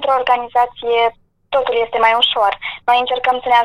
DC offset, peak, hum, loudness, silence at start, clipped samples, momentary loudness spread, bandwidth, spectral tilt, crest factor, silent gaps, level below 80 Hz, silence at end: under 0.1%; 0 dBFS; none; -16 LUFS; 0 s; under 0.1%; 6 LU; 12 kHz; -2.5 dB/octave; 14 dB; none; -50 dBFS; 0 s